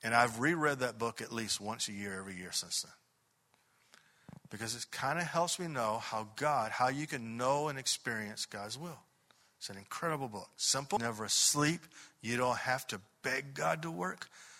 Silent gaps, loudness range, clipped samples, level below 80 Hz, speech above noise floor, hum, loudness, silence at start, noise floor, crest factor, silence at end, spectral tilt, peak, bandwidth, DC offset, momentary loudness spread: none; 7 LU; under 0.1%; -74 dBFS; 40 dB; none; -35 LUFS; 0 s; -75 dBFS; 24 dB; 0 s; -2.5 dB/octave; -12 dBFS; 16 kHz; under 0.1%; 12 LU